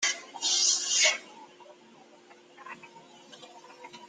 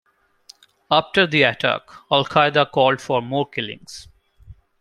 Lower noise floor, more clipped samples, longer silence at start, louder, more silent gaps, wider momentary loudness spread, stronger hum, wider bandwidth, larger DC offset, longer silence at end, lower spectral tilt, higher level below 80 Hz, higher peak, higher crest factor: first, -55 dBFS vs -51 dBFS; neither; second, 0 s vs 0.9 s; second, -24 LUFS vs -19 LUFS; neither; first, 26 LU vs 13 LU; neither; about the same, 13.5 kHz vs 12.5 kHz; neither; second, 0 s vs 0.3 s; second, 3 dB/octave vs -5 dB/octave; second, -90 dBFS vs -56 dBFS; second, -12 dBFS vs -2 dBFS; about the same, 22 dB vs 20 dB